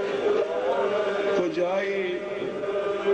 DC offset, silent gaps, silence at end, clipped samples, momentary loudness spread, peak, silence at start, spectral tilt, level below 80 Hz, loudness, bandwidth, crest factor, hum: under 0.1%; none; 0 s; under 0.1%; 5 LU; -12 dBFS; 0 s; -5.5 dB/octave; -64 dBFS; -26 LUFS; 9 kHz; 12 dB; none